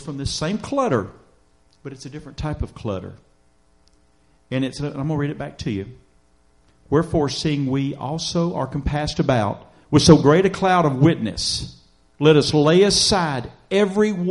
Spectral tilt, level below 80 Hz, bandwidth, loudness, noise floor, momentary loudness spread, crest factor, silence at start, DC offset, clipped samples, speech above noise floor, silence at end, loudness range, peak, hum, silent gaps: -5.5 dB/octave; -40 dBFS; 11.5 kHz; -20 LUFS; -60 dBFS; 16 LU; 20 dB; 0 s; under 0.1%; under 0.1%; 40 dB; 0 s; 13 LU; 0 dBFS; none; none